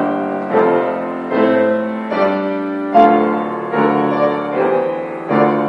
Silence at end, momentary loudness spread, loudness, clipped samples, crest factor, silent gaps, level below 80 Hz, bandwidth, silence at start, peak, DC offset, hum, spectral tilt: 0 s; 8 LU; -16 LUFS; under 0.1%; 16 dB; none; -60 dBFS; 6.2 kHz; 0 s; 0 dBFS; under 0.1%; none; -8.5 dB/octave